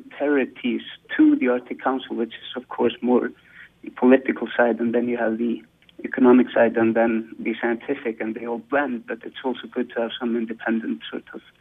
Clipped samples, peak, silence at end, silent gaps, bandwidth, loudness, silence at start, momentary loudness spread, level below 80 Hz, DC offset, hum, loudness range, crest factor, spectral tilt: under 0.1%; -4 dBFS; 0.2 s; none; 3.9 kHz; -22 LUFS; 0 s; 14 LU; -68 dBFS; under 0.1%; none; 6 LU; 20 dB; -8 dB/octave